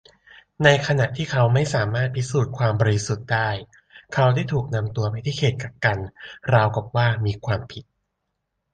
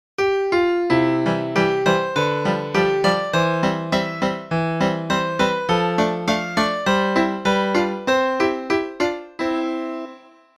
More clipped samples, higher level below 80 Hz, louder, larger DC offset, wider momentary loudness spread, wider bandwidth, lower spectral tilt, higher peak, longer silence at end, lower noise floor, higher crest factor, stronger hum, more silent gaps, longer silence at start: neither; about the same, -48 dBFS vs -52 dBFS; about the same, -22 LUFS vs -20 LUFS; neither; first, 9 LU vs 6 LU; second, 9.2 kHz vs 14 kHz; about the same, -6 dB/octave vs -5.5 dB/octave; about the same, -2 dBFS vs -4 dBFS; first, 0.9 s vs 0.4 s; first, -78 dBFS vs -44 dBFS; about the same, 20 dB vs 16 dB; neither; neither; first, 0.6 s vs 0.2 s